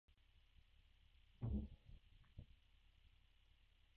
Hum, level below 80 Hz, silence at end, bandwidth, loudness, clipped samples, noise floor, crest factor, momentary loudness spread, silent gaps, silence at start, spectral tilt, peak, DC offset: none; -60 dBFS; 0.9 s; 4.9 kHz; -50 LUFS; under 0.1%; -74 dBFS; 22 dB; 20 LU; none; 0.35 s; -8.5 dB/octave; -34 dBFS; under 0.1%